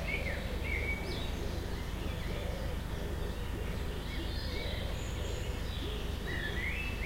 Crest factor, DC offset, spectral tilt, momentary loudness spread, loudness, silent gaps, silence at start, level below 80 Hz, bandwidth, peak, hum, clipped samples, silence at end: 14 dB; under 0.1%; -5 dB/octave; 4 LU; -38 LUFS; none; 0 s; -38 dBFS; 16 kHz; -22 dBFS; none; under 0.1%; 0 s